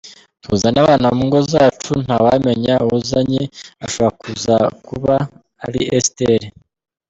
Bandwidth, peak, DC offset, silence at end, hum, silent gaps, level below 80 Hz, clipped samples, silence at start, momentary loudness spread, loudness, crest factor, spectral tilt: 8.4 kHz; -2 dBFS; under 0.1%; 0.6 s; none; none; -46 dBFS; under 0.1%; 0.05 s; 12 LU; -16 LUFS; 14 dB; -5.5 dB/octave